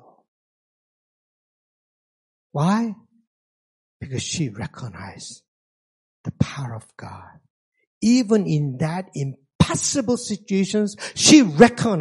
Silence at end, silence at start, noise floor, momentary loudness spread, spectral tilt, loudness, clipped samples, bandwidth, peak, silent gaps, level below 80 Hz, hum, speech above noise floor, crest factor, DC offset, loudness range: 0 s; 2.55 s; under -90 dBFS; 22 LU; -4.5 dB/octave; -20 LUFS; under 0.1%; 11.5 kHz; 0 dBFS; 3.27-4.00 s, 5.48-6.24 s, 7.50-7.72 s, 7.87-8.01 s, 9.55-9.59 s; -50 dBFS; none; over 70 dB; 22 dB; under 0.1%; 13 LU